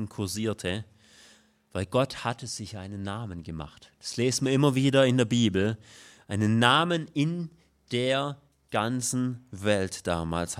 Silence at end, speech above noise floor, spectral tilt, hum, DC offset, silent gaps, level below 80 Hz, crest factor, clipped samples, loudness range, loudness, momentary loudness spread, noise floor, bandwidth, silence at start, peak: 0 s; 31 dB; -5 dB/octave; none; under 0.1%; none; -60 dBFS; 22 dB; under 0.1%; 9 LU; -27 LUFS; 16 LU; -59 dBFS; 15 kHz; 0 s; -4 dBFS